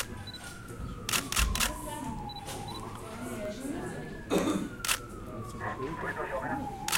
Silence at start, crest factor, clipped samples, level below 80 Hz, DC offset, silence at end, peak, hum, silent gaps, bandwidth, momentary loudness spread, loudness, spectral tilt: 0 s; 22 dB; under 0.1%; -44 dBFS; under 0.1%; 0 s; -12 dBFS; none; none; 17 kHz; 12 LU; -34 LUFS; -3 dB/octave